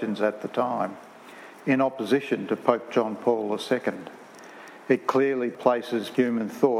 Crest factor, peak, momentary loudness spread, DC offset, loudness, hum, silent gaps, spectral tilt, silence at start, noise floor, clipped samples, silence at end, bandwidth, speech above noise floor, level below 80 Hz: 22 dB; -4 dBFS; 20 LU; under 0.1%; -26 LUFS; none; none; -6 dB/octave; 0 s; -46 dBFS; under 0.1%; 0 s; 15 kHz; 21 dB; -80 dBFS